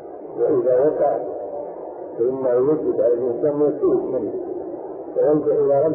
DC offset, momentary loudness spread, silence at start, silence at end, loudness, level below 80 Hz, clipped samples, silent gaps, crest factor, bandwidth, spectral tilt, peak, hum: under 0.1%; 13 LU; 0 s; 0 s; -20 LUFS; -60 dBFS; under 0.1%; none; 14 dB; 2.5 kHz; -13.5 dB/octave; -8 dBFS; none